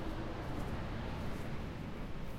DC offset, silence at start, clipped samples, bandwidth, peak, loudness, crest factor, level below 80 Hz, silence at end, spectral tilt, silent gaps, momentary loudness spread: under 0.1%; 0 s; under 0.1%; 16 kHz; -28 dBFS; -43 LUFS; 12 dB; -46 dBFS; 0 s; -7 dB/octave; none; 3 LU